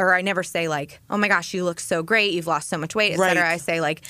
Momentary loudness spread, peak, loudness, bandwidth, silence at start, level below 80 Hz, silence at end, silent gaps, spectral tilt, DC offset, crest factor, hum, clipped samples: 8 LU; -6 dBFS; -21 LUFS; 15.5 kHz; 0 s; -64 dBFS; 0 s; none; -3.5 dB/octave; under 0.1%; 16 dB; none; under 0.1%